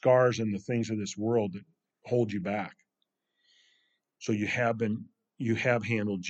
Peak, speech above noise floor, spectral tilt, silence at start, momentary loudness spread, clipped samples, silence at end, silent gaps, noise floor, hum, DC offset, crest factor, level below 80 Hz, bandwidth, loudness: -10 dBFS; 53 dB; -6 dB/octave; 0.05 s; 9 LU; under 0.1%; 0 s; none; -82 dBFS; none; under 0.1%; 20 dB; -74 dBFS; 8.2 kHz; -30 LUFS